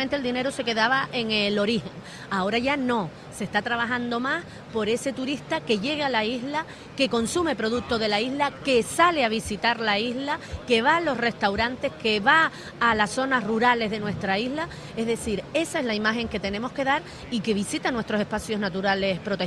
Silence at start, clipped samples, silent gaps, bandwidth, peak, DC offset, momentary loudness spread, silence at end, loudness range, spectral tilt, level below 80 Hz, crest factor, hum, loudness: 0 s; under 0.1%; none; 14 kHz; -6 dBFS; under 0.1%; 8 LU; 0 s; 4 LU; -4 dB/octave; -52 dBFS; 20 dB; none; -25 LUFS